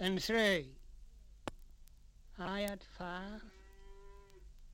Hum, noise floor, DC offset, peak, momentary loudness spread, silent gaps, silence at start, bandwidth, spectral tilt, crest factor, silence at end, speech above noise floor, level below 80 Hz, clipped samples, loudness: 50 Hz at -65 dBFS; -58 dBFS; under 0.1%; -18 dBFS; 28 LU; none; 0 s; 16.5 kHz; -4.5 dB/octave; 22 dB; 0 s; 21 dB; -56 dBFS; under 0.1%; -38 LUFS